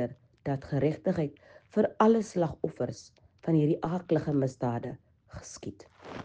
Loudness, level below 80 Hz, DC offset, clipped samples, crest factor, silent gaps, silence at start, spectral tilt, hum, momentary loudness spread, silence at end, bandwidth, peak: -30 LUFS; -60 dBFS; under 0.1%; under 0.1%; 22 dB; none; 0 s; -7.5 dB/octave; none; 20 LU; 0 s; 9.4 kHz; -10 dBFS